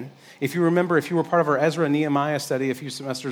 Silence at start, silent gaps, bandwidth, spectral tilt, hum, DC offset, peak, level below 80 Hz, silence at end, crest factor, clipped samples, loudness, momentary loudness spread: 0 s; none; 18 kHz; -6 dB/octave; none; under 0.1%; -6 dBFS; -76 dBFS; 0 s; 16 dB; under 0.1%; -23 LUFS; 10 LU